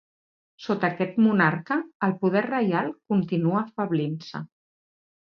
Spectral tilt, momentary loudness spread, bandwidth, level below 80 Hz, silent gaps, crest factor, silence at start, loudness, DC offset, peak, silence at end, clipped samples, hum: -8.5 dB/octave; 13 LU; 6.6 kHz; -70 dBFS; 1.95-2.00 s; 18 dB; 0.6 s; -25 LUFS; under 0.1%; -8 dBFS; 0.75 s; under 0.1%; none